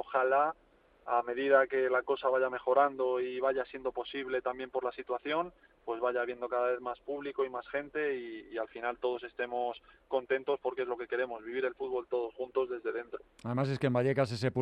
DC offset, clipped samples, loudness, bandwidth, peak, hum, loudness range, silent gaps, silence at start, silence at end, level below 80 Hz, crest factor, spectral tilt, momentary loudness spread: under 0.1%; under 0.1%; -33 LUFS; 9.6 kHz; -12 dBFS; none; 6 LU; none; 0 s; 0 s; -70 dBFS; 22 dB; -7 dB/octave; 11 LU